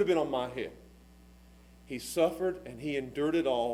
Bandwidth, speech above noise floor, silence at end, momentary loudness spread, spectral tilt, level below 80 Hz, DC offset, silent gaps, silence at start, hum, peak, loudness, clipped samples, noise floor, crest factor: 16 kHz; 25 dB; 0 s; 12 LU; -5 dB/octave; -58 dBFS; under 0.1%; none; 0 s; none; -14 dBFS; -32 LUFS; under 0.1%; -56 dBFS; 18 dB